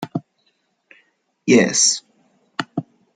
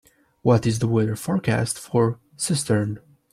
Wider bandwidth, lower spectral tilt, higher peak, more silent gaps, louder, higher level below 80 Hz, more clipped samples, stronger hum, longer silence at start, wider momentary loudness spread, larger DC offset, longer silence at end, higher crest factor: second, 11 kHz vs 14.5 kHz; second, -2.5 dB/octave vs -5.5 dB/octave; about the same, -2 dBFS vs -4 dBFS; neither; first, -18 LUFS vs -23 LUFS; second, -66 dBFS vs -54 dBFS; neither; neither; second, 0 s vs 0.45 s; first, 17 LU vs 7 LU; neither; about the same, 0.35 s vs 0.35 s; about the same, 20 dB vs 18 dB